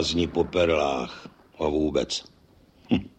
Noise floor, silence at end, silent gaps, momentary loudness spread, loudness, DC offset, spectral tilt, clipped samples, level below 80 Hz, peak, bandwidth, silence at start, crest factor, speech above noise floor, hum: -57 dBFS; 0.1 s; none; 9 LU; -26 LUFS; under 0.1%; -5 dB/octave; under 0.1%; -46 dBFS; -10 dBFS; 9 kHz; 0 s; 18 dB; 32 dB; none